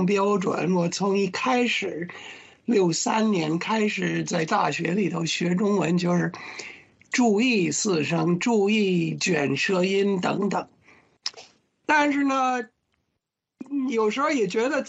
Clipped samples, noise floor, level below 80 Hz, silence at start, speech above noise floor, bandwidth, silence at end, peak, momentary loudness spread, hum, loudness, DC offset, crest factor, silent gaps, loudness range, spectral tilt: under 0.1%; -81 dBFS; -68 dBFS; 0 s; 57 dB; 8.4 kHz; 0 s; -8 dBFS; 13 LU; none; -24 LUFS; under 0.1%; 16 dB; none; 3 LU; -5 dB/octave